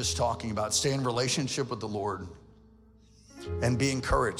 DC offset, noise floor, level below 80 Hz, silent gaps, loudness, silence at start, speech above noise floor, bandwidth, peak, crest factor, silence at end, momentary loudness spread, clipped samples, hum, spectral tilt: under 0.1%; -57 dBFS; -46 dBFS; none; -29 LUFS; 0 s; 28 dB; 16 kHz; -12 dBFS; 18 dB; 0 s; 12 LU; under 0.1%; none; -4 dB/octave